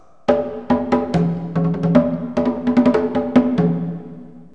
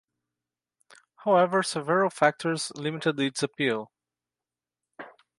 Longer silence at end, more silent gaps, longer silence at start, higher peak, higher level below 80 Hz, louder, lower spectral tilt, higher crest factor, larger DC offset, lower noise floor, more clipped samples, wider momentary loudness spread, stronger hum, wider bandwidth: second, 0.1 s vs 0.3 s; neither; second, 0.3 s vs 1.2 s; first, 0 dBFS vs -6 dBFS; first, -44 dBFS vs -78 dBFS; first, -18 LUFS vs -26 LUFS; first, -9 dB/octave vs -4.5 dB/octave; about the same, 18 dB vs 22 dB; first, 0.6% vs under 0.1%; second, -37 dBFS vs under -90 dBFS; neither; second, 9 LU vs 21 LU; second, none vs 60 Hz at -60 dBFS; second, 7.2 kHz vs 11.5 kHz